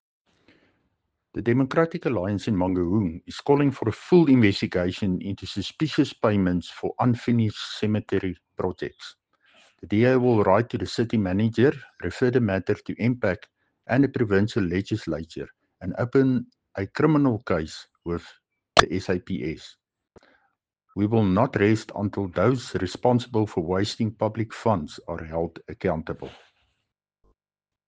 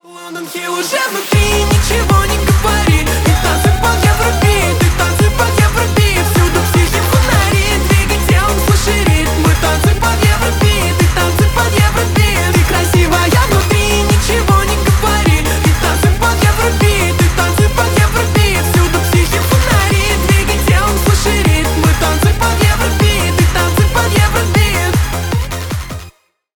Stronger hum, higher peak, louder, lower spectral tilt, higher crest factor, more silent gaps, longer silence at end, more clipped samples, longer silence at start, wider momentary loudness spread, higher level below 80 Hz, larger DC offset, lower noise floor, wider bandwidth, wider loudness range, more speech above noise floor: neither; about the same, -2 dBFS vs 0 dBFS; second, -24 LUFS vs -12 LUFS; first, -7 dB/octave vs -4.5 dB/octave; first, 24 dB vs 10 dB; neither; first, 1.55 s vs 0.45 s; neither; first, 1.35 s vs 0.05 s; first, 14 LU vs 1 LU; second, -52 dBFS vs -16 dBFS; second, under 0.1% vs 1%; first, under -90 dBFS vs -40 dBFS; second, 9.4 kHz vs over 20 kHz; first, 5 LU vs 1 LU; first, over 66 dB vs 27 dB